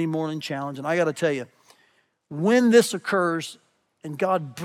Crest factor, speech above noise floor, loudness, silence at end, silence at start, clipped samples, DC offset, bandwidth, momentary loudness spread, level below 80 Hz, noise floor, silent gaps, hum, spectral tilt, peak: 20 dB; 42 dB; -23 LUFS; 0 s; 0 s; under 0.1%; under 0.1%; 16 kHz; 19 LU; -84 dBFS; -65 dBFS; none; none; -5 dB/octave; -6 dBFS